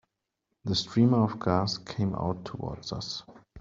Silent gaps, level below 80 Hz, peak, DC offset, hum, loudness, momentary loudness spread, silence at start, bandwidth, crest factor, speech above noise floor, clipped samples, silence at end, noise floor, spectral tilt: none; -58 dBFS; -10 dBFS; under 0.1%; none; -29 LUFS; 13 LU; 0.65 s; 7.6 kHz; 20 dB; 54 dB; under 0.1%; 0 s; -82 dBFS; -6.5 dB/octave